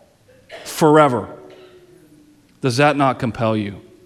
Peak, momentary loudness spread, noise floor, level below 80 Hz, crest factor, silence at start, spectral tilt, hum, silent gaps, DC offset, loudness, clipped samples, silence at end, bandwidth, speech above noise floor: -2 dBFS; 17 LU; -51 dBFS; -56 dBFS; 18 dB; 0.5 s; -6 dB/octave; none; none; under 0.1%; -17 LUFS; under 0.1%; 0.25 s; 15.5 kHz; 35 dB